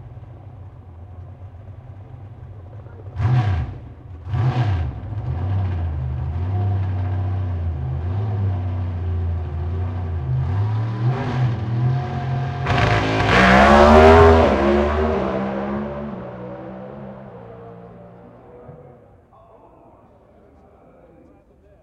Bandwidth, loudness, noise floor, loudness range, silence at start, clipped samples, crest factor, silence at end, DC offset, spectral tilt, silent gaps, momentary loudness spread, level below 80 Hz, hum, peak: 9 kHz; -19 LUFS; -51 dBFS; 18 LU; 0 s; under 0.1%; 20 dB; 3 s; under 0.1%; -7.5 dB/octave; none; 27 LU; -32 dBFS; none; 0 dBFS